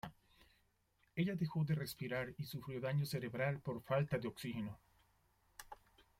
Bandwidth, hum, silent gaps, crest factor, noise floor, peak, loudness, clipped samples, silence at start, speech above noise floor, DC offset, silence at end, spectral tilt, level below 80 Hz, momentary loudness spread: 16.5 kHz; none; none; 18 dB; -78 dBFS; -24 dBFS; -41 LUFS; under 0.1%; 0.05 s; 38 dB; under 0.1%; 0.45 s; -6.5 dB/octave; -70 dBFS; 19 LU